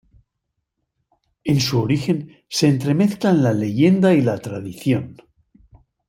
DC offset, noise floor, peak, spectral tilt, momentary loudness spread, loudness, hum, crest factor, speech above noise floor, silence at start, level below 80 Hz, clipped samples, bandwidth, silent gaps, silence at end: under 0.1%; -77 dBFS; -4 dBFS; -6.5 dB/octave; 11 LU; -19 LUFS; none; 16 dB; 59 dB; 1.45 s; -56 dBFS; under 0.1%; 16 kHz; none; 0.95 s